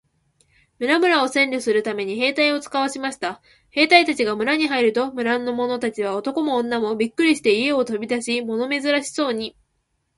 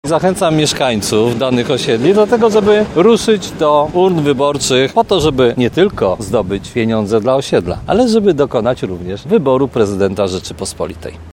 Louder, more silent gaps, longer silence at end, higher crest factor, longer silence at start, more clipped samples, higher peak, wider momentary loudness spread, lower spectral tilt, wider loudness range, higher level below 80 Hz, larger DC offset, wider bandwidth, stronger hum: second, -20 LUFS vs -13 LUFS; neither; first, 0.7 s vs 0.05 s; first, 20 dB vs 12 dB; first, 0.8 s vs 0.05 s; neither; about the same, 0 dBFS vs 0 dBFS; about the same, 9 LU vs 8 LU; second, -3 dB/octave vs -5 dB/octave; about the same, 2 LU vs 3 LU; second, -64 dBFS vs -38 dBFS; neither; second, 11.5 kHz vs 16.5 kHz; neither